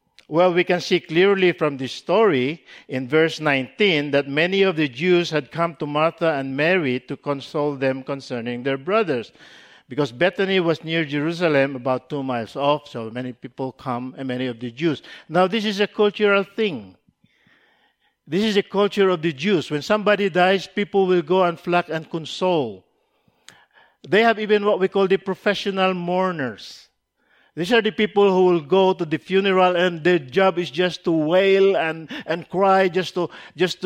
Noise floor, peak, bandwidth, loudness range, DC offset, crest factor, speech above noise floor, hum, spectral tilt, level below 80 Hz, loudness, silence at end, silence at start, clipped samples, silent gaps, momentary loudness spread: -65 dBFS; -4 dBFS; 10 kHz; 5 LU; under 0.1%; 18 dB; 44 dB; none; -6 dB/octave; -66 dBFS; -20 LUFS; 0 s; 0.3 s; under 0.1%; none; 11 LU